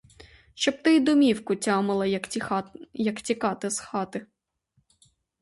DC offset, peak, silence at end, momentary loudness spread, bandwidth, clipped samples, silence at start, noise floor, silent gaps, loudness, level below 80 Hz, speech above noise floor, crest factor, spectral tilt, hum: under 0.1%; -8 dBFS; 1.2 s; 11 LU; 11.5 kHz; under 0.1%; 0.55 s; -71 dBFS; none; -25 LUFS; -64 dBFS; 46 dB; 18 dB; -4.5 dB/octave; none